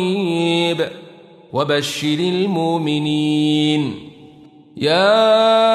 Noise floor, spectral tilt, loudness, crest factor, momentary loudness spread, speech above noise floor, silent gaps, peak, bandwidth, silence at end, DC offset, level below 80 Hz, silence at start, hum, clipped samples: -44 dBFS; -5.5 dB/octave; -17 LUFS; 14 dB; 10 LU; 28 dB; none; -2 dBFS; 13.5 kHz; 0 s; under 0.1%; -64 dBFS; 0 s; none; under 0.1%